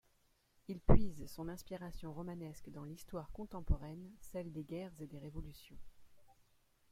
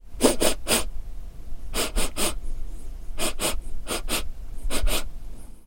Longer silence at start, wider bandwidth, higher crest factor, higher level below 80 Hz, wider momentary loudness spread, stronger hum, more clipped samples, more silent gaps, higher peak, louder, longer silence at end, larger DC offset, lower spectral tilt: first, 0.7 s vs 0.05 s; second, 14.5 kHz vs 17 kHz; first, 26 dB vs 20 dB; second, -46 dBFS vs -30 dBFS; second, 17 LU vs 20 LU; neither; neither; neither; second, -12 dBFS vs -4 dBFS; second, -43 LUFS vs -26 LUFS; first, 0.7 s vs 0 s; neither; first, -7.5 dB/octave vs -2.5 dB/octave